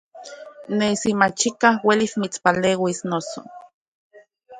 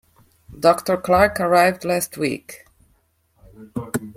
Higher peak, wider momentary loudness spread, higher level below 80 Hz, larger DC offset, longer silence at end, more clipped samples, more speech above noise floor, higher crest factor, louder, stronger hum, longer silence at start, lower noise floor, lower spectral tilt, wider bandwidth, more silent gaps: about the same, 0 dBFS vs -2 dBFS; first, 20 LU vs 16 LU; second, -62 dBFS vs -50 dBFS; neither; about the same, 0 s vs 0.05 s; neither; second, 20 dB vs 44 dB; about the same, 22 dB vs 20 dB; about the same, -20 LUFS vs -19 LUFS; neither; second, 0.15 s vs 0.5 s; second, -40 dBFS vs -63 dBFS; about the same, -4 dB/octave vs -4.5 dB/octave; second, 9.6 kHz vs 16.5 kHz; first, 3.74-4.10 s vs none